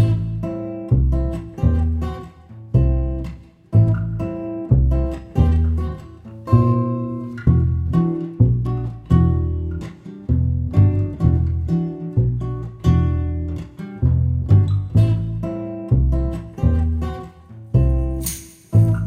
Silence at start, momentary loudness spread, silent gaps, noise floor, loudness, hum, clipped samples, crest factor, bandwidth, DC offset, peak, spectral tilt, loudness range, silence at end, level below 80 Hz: 0 s; 12 LU; none; -39 dBFS; -20 LUFS; none; under 0.1%; 18 dB; 16 kHz; under 0.1%; -2 dBFS; -8.5 dB/octave; 2 LU; 0 s; -26 dBFS